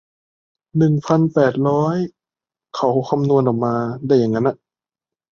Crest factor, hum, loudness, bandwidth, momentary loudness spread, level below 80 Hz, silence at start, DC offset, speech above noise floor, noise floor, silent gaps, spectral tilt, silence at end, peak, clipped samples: 16 dB; none; -18 LUFS; 7.2 kHz; 9 LU; -58 dBFS; 0.75 s; under 0.1%; over 73 dB; under -90 dBFS; none; -8.5 dB/octave; 0.75 s; -2 dBFS; under 0.1%